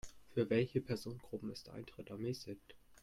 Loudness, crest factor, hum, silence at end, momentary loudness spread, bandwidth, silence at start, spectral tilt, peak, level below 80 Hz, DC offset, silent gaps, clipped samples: -41 LUFS; 20 dB; none; 0.05 s; 16 LU; 16 kHz; 0.05 s; -6.5 dB/octave; -22 dBFS; -66 dBFS; under 0.1%; none; under 0.1%